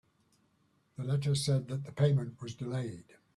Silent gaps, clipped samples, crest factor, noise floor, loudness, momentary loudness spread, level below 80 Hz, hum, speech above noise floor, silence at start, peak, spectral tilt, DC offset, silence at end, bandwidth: none; under 0.1%; 18 dB; -72 dBFS; -33 LUFS; 13 LU; -68 dBFS; none; 40 dB; 1 s; -16 dBFS; -6.5 dB/octave; under 0.1%; 0.35 s; 12.5 kHz